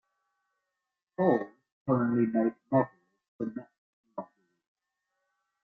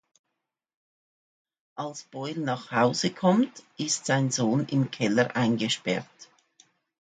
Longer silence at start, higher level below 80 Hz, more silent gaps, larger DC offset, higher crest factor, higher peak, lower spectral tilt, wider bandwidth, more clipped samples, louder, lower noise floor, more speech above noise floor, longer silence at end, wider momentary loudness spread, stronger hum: second, 1.2 s vs 1.75 s; about the same, -72 dBFS vs -72 dBFS; first, 1.72-1.86 s, 3.28-3.39 s, 3.78-4.04 s vs none; neither; about the same, 22 dB vs 18 dB; about the same, -12 dBFS vs -10 dBFS; first, -11 dB/octave vs -4.5 dB/octave; second, 4.1 kHz vs 9.6 kHz; neither; about the same, -29 LUFS vs -27 LUFS; about the same, -87 dBFS vs -84 dBFS; about the same, 59 dB vs 58 dB; first, 1.4 s vs 0.75 s; first, 18 LU vs 13 LU; neither